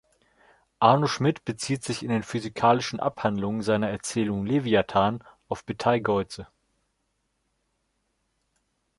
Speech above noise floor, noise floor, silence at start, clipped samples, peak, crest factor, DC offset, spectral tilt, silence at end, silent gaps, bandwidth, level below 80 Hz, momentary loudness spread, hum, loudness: 50 dB; -75 dBFS; 0.8 s; under 0.1%; -4 dBFS; 22 dB; under 0.1%; -5.5 dB/octave; 2.55 s; none; 11.5 kHz; -58 dBFS; 11 LU; none; -25 LUFS